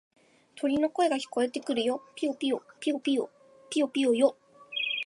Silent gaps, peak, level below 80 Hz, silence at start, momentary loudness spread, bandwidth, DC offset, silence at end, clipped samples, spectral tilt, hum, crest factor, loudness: none; -10 dBFS; -74 dBFS; 0.55 s; 7 LU; 11.5 kHz; under 0.1%; 0 s; under 0.1%; -3 dB/octave; none; 18 dB; -29 LUFS